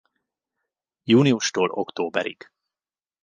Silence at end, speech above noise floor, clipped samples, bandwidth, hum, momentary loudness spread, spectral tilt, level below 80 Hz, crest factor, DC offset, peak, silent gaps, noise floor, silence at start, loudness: 0.9 s; over 69 dB; under 0.1%; 9.8 kHz; none; 12 LU; -5 dB/octave; -70 dBFS; 20 dB; under 0.1%; -6 dBFS; none; under -90 dBFS; 1.05 s; -22 LUFS